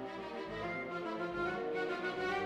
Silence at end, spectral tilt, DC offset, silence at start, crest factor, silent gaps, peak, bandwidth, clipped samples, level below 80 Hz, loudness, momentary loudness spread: 0 s; -5.5 dB/octave; under 0.1%; 0 s; 14 dB; none; -24 dBFS; 11.5 kHz; under 0.1%; -64 dBFS; -39 LUFS; 6 LU